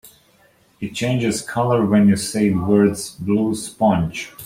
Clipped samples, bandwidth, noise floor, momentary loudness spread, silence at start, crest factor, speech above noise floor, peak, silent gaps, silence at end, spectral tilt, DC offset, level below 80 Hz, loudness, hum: under 0.1%; 16 kHz; -56 dBFS; 10 LU; 0.05 s; 16 dB; 38 dB; -4 dBFS; none; 0 s; -6 dB/octave; under 0.1%; -50 dBFS; -19 LUFS; none